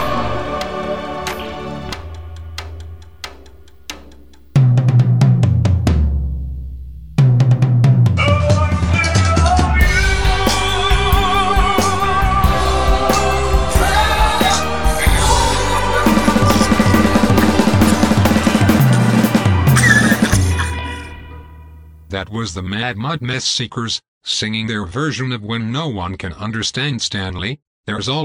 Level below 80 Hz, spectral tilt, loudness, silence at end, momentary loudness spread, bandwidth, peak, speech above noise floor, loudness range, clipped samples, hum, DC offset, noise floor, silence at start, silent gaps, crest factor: -24 dBFS; -5 dB/octave; -15 LUFS; 0 s; 15 LU; 19 kHz; 0 dBFS; 22 dB; 9 LU; under 0.1%; none; 0.9%; -43 dBFS; 0 s; 24.08-24.21 s, 27.67-27.83 s; 14 dB